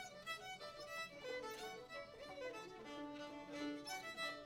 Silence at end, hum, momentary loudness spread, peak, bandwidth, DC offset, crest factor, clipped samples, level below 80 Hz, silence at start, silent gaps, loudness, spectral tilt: 0 s; none; 6 LU; -34 dBFS; 17.5 kHz; under 0.1%; 16 dB; under 0.1%; -76 dBFS; 0 s; none; -49 LUFS; -2.5 dB/octave